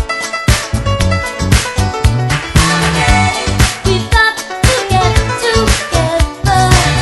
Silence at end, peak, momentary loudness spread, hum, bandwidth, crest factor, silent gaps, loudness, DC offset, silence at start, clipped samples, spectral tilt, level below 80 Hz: 0 s; 0 dBFS; 5 LU; none; 12.5 kHz; 12 dB; none; -12 LUFS; under 0.1%; 0 s; 0.4%; -4 dB/octave; -18 dBFS